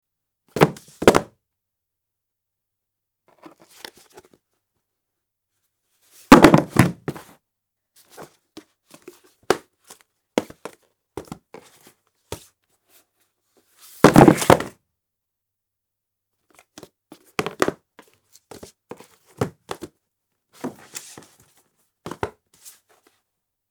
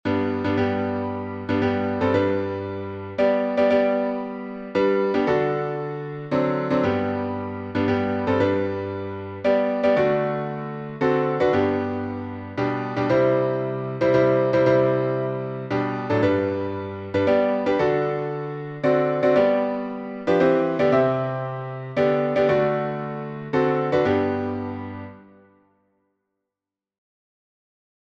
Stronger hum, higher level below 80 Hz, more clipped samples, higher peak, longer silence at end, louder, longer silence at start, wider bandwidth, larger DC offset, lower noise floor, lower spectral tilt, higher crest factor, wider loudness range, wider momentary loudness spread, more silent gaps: neither; first, -48 dBFS vs -56 dBFS; neither; first, 0 dBFS vs -6 dBFS; second, 1.4 s vs 2.85 s; first, -18 LUFS vs -23 LUFS; first, 0.55 s vs 0.05 s; first, over 20 kHz vs 7.2 kHz; neither; second, -82 dBFS vs -88 dBFS; second, -5.5 dB/octave vs -8.5 dB/octave; first, 24 dB vs 16 dB; first, 19 LU vs 3 LU; first, 29 LU vs 11 LU; neither